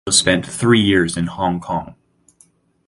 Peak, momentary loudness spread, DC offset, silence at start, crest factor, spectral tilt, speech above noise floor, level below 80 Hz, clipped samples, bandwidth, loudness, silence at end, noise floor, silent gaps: 0 dBFS; 10 LU; under 0.1%; 0.05 s; 18 dB; -3.5 dB/octave; 39 dB; -44 dBFS; under 0.1%; 11.5 kHz; -17 LUFS; 0.95 s; -55 dBFS; none